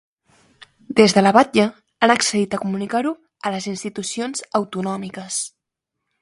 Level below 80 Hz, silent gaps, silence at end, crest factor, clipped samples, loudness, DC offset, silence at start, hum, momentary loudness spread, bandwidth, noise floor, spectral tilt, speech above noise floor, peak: -62 dBFS; none; 0.75 s; 20 dB; under 0.1%; -20 LUFS; under 0.1%; 0.6 s; none; 13 LU; 11.5 kHz; -81 dBFS; -4 dB/octave; 62 dB; 0 dBFS